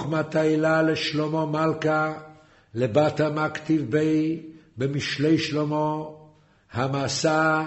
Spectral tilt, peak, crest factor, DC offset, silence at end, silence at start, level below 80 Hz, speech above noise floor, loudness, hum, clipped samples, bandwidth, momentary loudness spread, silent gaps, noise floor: -5.5 dB/octave; -6 dBFS; 18 dB; under 0.1%; 0 s; 0 s; -60 dBFS; 31 dB; -24 LUFS; none; under 0.1%; 8.2 kHz; 10 LU; none; -54 dBFS